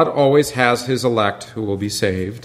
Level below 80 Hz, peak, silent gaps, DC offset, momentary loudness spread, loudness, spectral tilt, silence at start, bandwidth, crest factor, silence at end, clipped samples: -52 dBFS; 0 dBFS; none; under 0.1%; 9 LU; -18 LUFS; -5 dB/octave; 0 s; 16 kHz; 18 dB; 0 s; under 0.1%